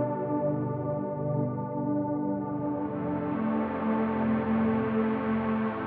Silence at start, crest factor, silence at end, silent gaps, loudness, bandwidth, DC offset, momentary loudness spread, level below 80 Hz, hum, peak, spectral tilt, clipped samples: 0 s; 12 dB; 0 s; none; -29 LUFS; 4.2 kHz; under 0.1%; 5 LU; -60 dBFS; none; -16 dBFS; -8 dB/octave; under 0.1%